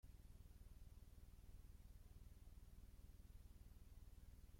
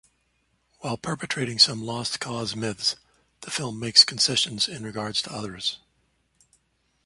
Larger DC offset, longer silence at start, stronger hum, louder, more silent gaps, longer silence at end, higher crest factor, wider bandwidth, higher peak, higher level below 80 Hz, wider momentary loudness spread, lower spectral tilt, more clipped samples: neither; second, 0.05 s vs 0.8 s; neither; second, -67 LUFS vs -23 LUFS; neither; second, 0 s vs 1.3 s; second, 12 dB vs 26 dB; first, 16.5 kHz vs 11.5 kHz; second, -50 dBFS vs -2 dBFS; about the same, -64 dBFS vs -62 dBFS; second, 1 LU vs 16 LU; first, -5.5 dB/octave vs -2 dB/octave; neither